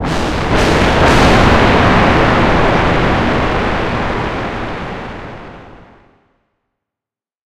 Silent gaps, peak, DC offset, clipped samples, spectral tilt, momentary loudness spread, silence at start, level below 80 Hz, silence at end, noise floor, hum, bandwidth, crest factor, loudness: none; 0 dBFS; under 0.1%; under 0.1%; -6 dB/octave; 15 LU; 0 s; -22 dBFS; 0 s; -88 dBFS; 60 Hz at -40 dBFS; 14.5 kHz; 14 dB; -12 LUFS